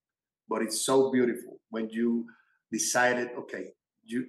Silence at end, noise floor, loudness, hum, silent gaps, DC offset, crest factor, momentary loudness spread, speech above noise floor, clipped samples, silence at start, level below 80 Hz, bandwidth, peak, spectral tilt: 0 s; -65 dBFS; -29 LUFS; none; none; under 0.1%; 18 dB; 16 LU; 36 dB; under 0.1%; 0.5 s; -88 dBFS; 12.5 kHz; -12 dBFS; -3 dB/octave